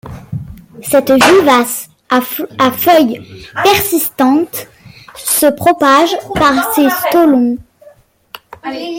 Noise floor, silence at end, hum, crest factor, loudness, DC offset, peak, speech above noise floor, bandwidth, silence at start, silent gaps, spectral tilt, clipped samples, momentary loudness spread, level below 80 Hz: -44 dBFS; 0 s; none; 12 dB; -11 LUFS; under 0.1%; 0 dBFS; 33 dB; 17 kHz; 0.05 s; none; -3.5 dB/octave; under 0.1%; 17 LU; -44 dBFS